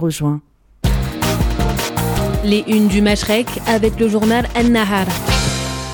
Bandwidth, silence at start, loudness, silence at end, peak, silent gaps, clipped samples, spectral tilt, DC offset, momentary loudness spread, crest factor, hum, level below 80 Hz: 19.5 kHz; 0 s; -16 LUFS; 0 s; -4 dBFS; none; under 0.1%; -5 dB/octave; under 0.1%; 6 LU; 12 dB; none; -26 dBFS